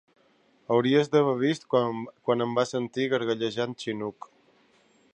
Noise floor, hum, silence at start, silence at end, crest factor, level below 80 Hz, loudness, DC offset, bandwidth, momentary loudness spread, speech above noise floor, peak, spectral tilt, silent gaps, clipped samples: -64 dBFS; none; 0.7 s; 1.05 s; 20 dB; -74 dBFS; -27 LUFS; under 0.1%; 9.8 kHz; 10 LU; 38 dB; -8 dBFS; -6 dB/octave; none; under 0.1%